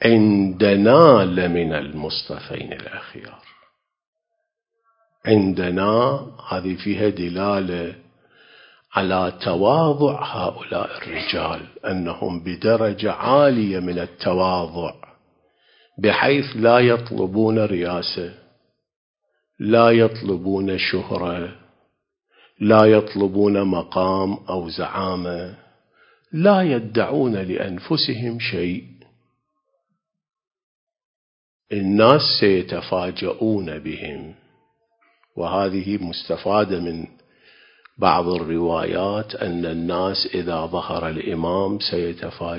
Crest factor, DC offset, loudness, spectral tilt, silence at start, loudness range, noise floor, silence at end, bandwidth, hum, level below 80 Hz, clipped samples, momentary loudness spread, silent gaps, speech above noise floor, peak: 20 dB; under 0.1%; -20 LUFS; -9.5 dB/octave; 0 s; 7 LU; -78 dBFS; 0 s; 5.4 kHz; none; -48 dBFS; under 0.1%; 15 LU; 4.07-4.13 s, 18.96-19.14 s, 30.63-30.87 s, 31.05-31.60 s; 58 dB; 0 dBFS